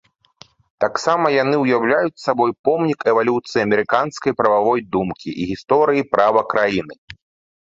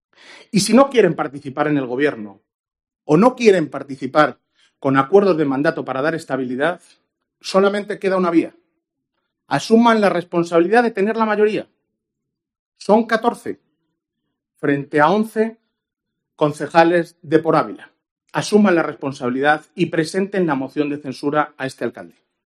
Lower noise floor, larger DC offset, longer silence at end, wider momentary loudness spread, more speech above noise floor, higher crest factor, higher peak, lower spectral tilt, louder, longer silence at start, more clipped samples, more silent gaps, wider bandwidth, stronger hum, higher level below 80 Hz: second, -49 dBFS vs -80 dBFS; neither; about the same, 0.5 s vs 0.4 s; second, 7 LU vs 12 LU; second, 32 dB vs 63 dB; about the same, 18 dB vs 18 dB; about the same, 0 dBFS vs 0 dBFS; about the same, -6 dB/octave vs -5.5 dB/octave; about the same, -18 LUFS vs -18 LUFS; first, 0.8 s vs 0.3 s; neither; second, 2.59-2.64 s, 6.98-7.08 s vs 2.54-2.64 s, 12.59-12.72 s, 18.11-18.16 s; second, 7.8 kHz vs 13 kHz; neither; first, -56 dBFS vs -66 dBFS